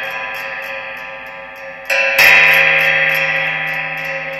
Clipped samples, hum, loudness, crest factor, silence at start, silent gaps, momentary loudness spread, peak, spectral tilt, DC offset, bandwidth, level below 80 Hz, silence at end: under 0.1%; none; -11 LUFS; 16 dB; 0 s; none; 22 LU; 0 dBFS; -1.5 dB/octave; under 0.1%; 17.5 kHz; -54 dBFS; 0 s